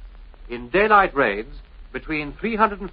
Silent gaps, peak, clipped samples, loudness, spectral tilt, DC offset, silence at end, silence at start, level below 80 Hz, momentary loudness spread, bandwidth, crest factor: none; -2 dBFS; under 0.1%; -20 LUFS; -3 dB/octave; under 0.1%; 0 s; 0 s; -40 dBFS; 20 LU; 5.2 kHz; 20 dB